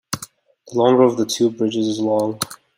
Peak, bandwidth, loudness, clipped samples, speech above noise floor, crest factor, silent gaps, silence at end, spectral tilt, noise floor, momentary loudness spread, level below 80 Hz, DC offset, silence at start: -2 dBFS; 16 kHz; -18 LUFS; under 0.1%; 24 dB; 18 dB; none; 0.25 s; -5 dB/octave; -42 dBFS; 15 LU; -62 dBFS; under 0.1%; 0.1 s